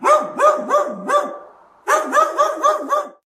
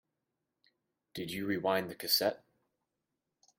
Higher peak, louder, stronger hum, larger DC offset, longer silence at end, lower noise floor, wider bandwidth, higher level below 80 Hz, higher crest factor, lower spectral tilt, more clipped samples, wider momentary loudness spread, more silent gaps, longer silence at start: first, -2 dBFS vs -16 dBFS; first, -17 LUFS vs -33 LUFS; neither; neither; second, 0.15 s vs 1.25 s; second, -43 dBFS vs -87 dBFS; about the same, 15 kHz vs 16 kHz; first, -70 dBFS vs -76 dBFS; second, 14 dB vs 22 dB; about the same, -2.5 dB/octave vs -3 dB/octave; neither; second, 9 LU vs 17 LU; neither; second, 0 s vs 1.15 s